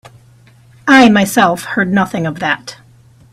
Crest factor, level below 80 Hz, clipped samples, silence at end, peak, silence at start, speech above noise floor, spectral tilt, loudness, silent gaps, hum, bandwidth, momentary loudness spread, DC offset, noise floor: 14 dB; -50 dBFS; under 0.1%; 0.6 s; 0 dBFS; 0.85 s; 33 dB; -5 dB/octave; -12 LUFS; none; none; 16 kHz; 13 LU; under 0.1%; -45 dBFS